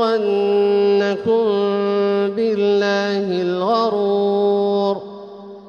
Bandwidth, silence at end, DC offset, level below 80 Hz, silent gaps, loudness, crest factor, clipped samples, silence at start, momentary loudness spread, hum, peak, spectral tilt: 6.8 kHz; 0 s; under 0.1%; -64 dBFS; none; -18 LUFS; 12 dB; under 0.1%; 0 s; 4 LU; none; -6 dBFS; -6.5 dB/octave